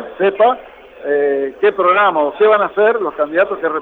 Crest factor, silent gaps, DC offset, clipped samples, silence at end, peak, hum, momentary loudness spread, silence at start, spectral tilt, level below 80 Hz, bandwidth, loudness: 12 dB; none; under 0.1%; under 0.1%; 0 s; -2 dBFS; none; 6 LU; 0 s; -7 dB/octave; -58 dBFS; 4.1 kHz; -14 LUFS